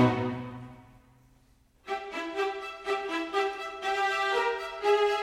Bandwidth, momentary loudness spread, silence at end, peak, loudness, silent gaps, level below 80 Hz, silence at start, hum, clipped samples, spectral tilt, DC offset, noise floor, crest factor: 14.5 kHz; 13 LU; 0 s; -10 dBFS; -30 LUFS; none; -62 dBFS; 0 s; none; under 0.1%; -5.5 dB/octave; under 0.1%; -63 dBFS; 20 dB